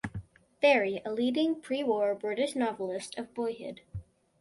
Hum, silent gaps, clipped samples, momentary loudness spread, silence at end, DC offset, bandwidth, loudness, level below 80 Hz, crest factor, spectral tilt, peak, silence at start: none; none; under 0.1%; 18 LU; 0.4 s; under 0.1%; 11.5 kHz; -30 LUFS; -60 dBFS; 20 dB; -5 dB/octave; -12 dBFS; 0.05 s